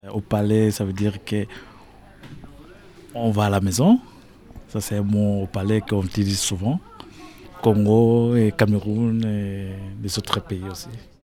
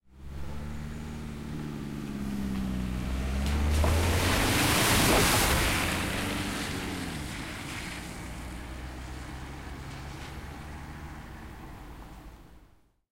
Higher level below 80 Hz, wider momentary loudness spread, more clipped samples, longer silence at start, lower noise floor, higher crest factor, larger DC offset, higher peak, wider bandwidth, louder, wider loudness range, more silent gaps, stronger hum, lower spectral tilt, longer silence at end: second, -48 dBFS vs -38 dBFS; about the same, 20 LU vs 20 LU; neither; about the same, 0.05 s vs 0.1 s; second, -46 dBFS vs -60 dBFS; about the same, 20 dB vs 20 dB; neither; first, -2 dBFS vs -12 dBFS; about the same, 16 kHz vs 16 kHz; first, -21 LUFS vs -29 LUFS; second, 4 LU vs 17 LU; neither; neither; first, -6 dB/octave vs -4 dB/octave; second, 0.3 s vs 0.5 s